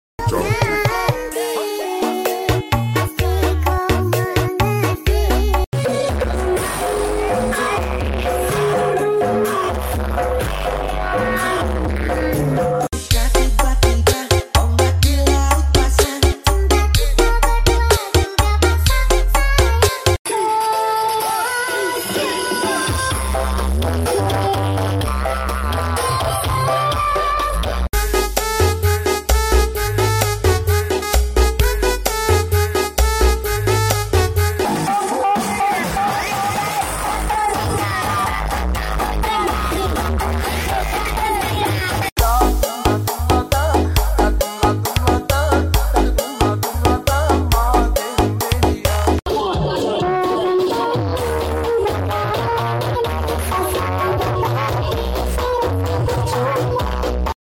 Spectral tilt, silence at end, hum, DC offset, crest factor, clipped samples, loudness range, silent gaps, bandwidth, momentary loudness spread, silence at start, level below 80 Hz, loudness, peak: -4.5 dB/octave; 0.15 s; none; under 0.1%; 14 dB; under 0.1%; 4 LU; 5.67-5.72 s, 20.19-20.25 s, 42.12-42.16 s; 17 kHz; 5 LU; 0.2 s; -22 dBFS; -18 LUFS; -4 dBFS